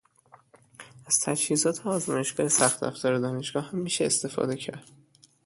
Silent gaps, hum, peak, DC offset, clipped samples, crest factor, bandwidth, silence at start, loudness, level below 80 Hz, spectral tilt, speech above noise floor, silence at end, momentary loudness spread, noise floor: none; none; -6 dBFS; under 0.1%; under 0.1%; 24 dB; 12 kHz; 0.8 s; -26 LUFS; -70 dBFS; -3 dB/octave; 31 dB; 0.65 s; 9 LU; -58 dBFS